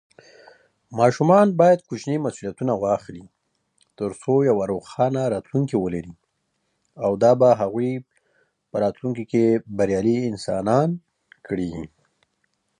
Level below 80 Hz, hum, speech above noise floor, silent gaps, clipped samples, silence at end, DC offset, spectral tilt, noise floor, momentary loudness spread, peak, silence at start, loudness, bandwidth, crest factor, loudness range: -56 dBFS; none; 52 dB; none; under 0.1%; 0.95 s; under 0.1%; -7.5 dB/octave; -73 dBFS; 15 LU; -2 dBFS; 0.9 s; -21 LUFS; 10.5 kHz; 20 dB; 3 LU